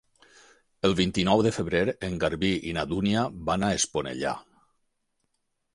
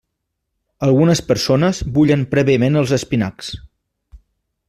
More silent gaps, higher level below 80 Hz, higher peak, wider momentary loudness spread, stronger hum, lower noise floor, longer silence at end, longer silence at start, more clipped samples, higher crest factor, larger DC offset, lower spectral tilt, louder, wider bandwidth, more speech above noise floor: neither; second, -50 dBFS vs -42 dBFS; second, -8 dBFS vs -2 dBFS; second, 7 LU vs 10 LU; neither; about the same, -76 dBFS vs -75 dBFS; first, 1.35 s vs 0.55 s; about the same, 0.85 s vs 0.8 s; neither; first, 20 dB vs 14 dB; neither; second, -4.5 dB/octave vs -6 dB/octave; second, -26 LUFS vs -16 LUFS; second, 11.5 kHz vs 14 kHz; second, 50 dB vs 60 dB